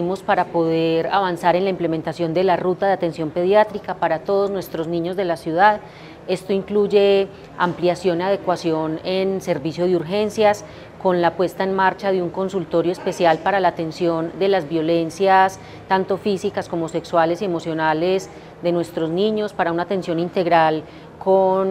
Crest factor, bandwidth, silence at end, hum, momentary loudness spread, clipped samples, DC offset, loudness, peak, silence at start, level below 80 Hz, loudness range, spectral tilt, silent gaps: 18 dB; 14.5 kHz; 0 s; none; 8 LU; under 0.1%; under 0.1%; -20 LUFS; 0 dBFS; 0 s; -56 dBFS; 2 LU; -6 dB/octave; none